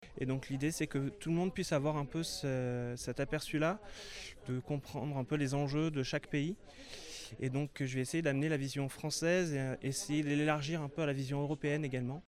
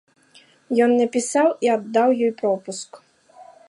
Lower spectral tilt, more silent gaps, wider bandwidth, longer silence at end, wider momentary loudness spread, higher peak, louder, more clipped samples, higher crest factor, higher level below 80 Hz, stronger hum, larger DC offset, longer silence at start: first, -5.5 dB/octave vs -4 dB/octave; neither; first, 15 kHz vs 11.5 kHz; second, 0.05 s vs 0.25 s; second, 9 LU vs 12 LU; second, -18 dBFS vs -6 dBFS; second, -36 LUFS vs -20 LUFS; neither; about the same, 18 dB vs 16 dB; first, -60 dBFS vs -76 dBFS; neither; neither; second, 0 s vs 0.7 s